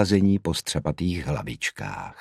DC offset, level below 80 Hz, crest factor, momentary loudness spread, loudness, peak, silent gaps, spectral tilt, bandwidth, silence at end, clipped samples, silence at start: under 0.1%; -44 dBFS; 20 dB; 10 LU; -26 LUFS; -4 dBFS; none; -5.5 dB/octave; 15 kHz; 0 s; under 0.1%; 0 s